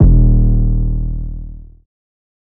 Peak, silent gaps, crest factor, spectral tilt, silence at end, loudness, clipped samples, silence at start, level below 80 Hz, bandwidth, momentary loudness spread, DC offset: 0 dBFS; none; 12 dB; -15 dB/octave; 0.8 s; -15 LUFS; 0.2%; 0 s; -14 dBFS; 1.2 kHz; 19 LU; under 0.1%